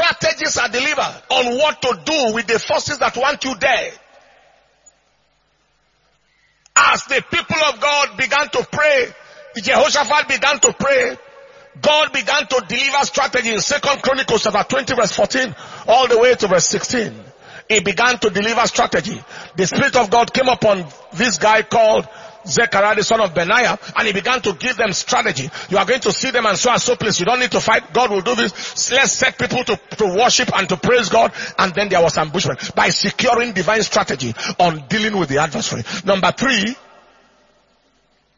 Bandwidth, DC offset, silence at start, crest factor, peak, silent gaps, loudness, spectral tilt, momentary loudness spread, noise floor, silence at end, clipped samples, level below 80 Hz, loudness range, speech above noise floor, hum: 7.6 kHz; under 0.1%; 0 s; 18 dB; 0 dBFS; none; -16 LUFS; -2.5 dB/octave; 7 LU; -62 dBFS; 1.6 s; under 0.1%; -50 dBFS; 3 LU; 45 dB; none